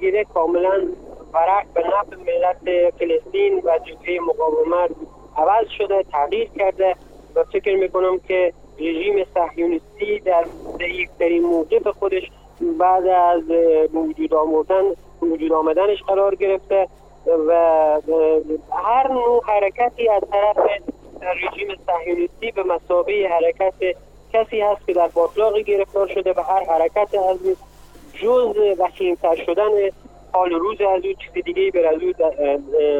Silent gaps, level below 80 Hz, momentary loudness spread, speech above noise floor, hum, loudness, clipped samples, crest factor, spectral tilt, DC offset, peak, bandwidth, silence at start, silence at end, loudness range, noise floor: none; -48 dBFS; 8 LU; 24 dB; 50 Hz at -50 dBFS; -19 LUFS; under 0.1%; 14 dB; -6 dB/octave; under 0.1%; -4 dBFS; 7.6 kHz; 0 s; 0 s; 3 LU; -42 dBFS